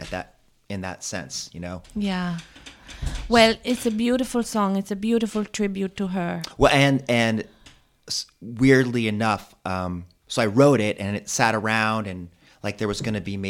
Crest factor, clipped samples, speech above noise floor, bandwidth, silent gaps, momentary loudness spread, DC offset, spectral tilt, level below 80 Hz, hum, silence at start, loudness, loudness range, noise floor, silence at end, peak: 22 dB; under 0.1%; 30 dB; 16.5 kHz; none; 16 LU; under 0.1%; -5 dB/octave; -44 dBFS; none; 0 s; -23 LUFS; 3 LU; -53 dBFS; 0 s; -2 dBFS